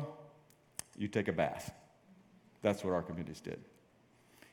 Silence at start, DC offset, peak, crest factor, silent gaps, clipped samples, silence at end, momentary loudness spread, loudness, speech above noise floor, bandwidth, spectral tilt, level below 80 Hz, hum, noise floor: 0 s; under 0.1%; -16 dBFS; 24 dB; none; under 0.1%; 0.9 s; 16 LU; -39 LUFS; 30 dB; 17.5 kHz; -5.5 dB/octave; -70 dBFS; none; -67 dBFS